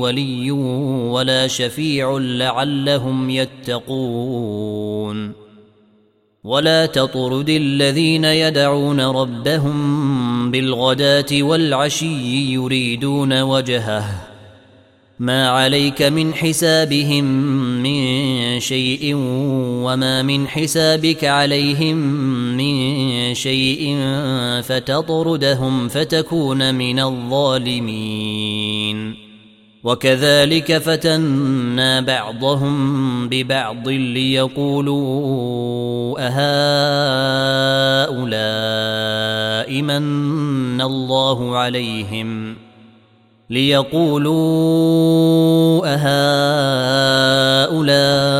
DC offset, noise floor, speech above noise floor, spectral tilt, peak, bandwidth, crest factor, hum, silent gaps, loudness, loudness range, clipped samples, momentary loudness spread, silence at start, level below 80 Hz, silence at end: under 0.1%; -57 dBFS; 40 dB; -5 dB/octave; -2 dBFS; 16 kHz; 16 dB; none; none; -17 LUFS; 5 LU; under 0.1%; 8 LU; 0 s; -52 dBFS; 0 s